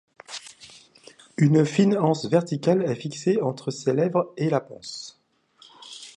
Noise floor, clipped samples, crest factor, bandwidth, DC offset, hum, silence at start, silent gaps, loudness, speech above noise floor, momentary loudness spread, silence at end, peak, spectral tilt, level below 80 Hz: -64 dBFS; under 0.1%; 18 dB; 11 kHz; under 0.1%; none; 0.3 s; none; -23 LUFS; 42 dB; 19 LU; 0.1 s; -6 dBFS; -6.5 dB/octave; -70 dBFS